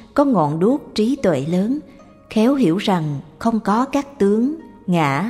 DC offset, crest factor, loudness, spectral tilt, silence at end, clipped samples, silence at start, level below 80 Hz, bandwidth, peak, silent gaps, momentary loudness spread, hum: under 0.1%; 16 dB; -19 LUFS; -7 dB/octave; 0 s; under 0.1%; 0.15 s; -52 dBFS; 14 kHz; -2 dBFS; none; 7 LU; none